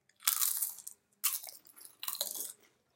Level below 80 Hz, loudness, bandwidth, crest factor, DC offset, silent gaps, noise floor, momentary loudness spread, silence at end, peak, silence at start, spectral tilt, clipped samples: under -90 dBFS; -34 LUFS; 17 kHz; 32 dB; under 0.1%; none; -56 dBFS; 20 LU; 0.45 s; -6 dBFS; 0.2 s; 3.5 dB/octave; under 0.1%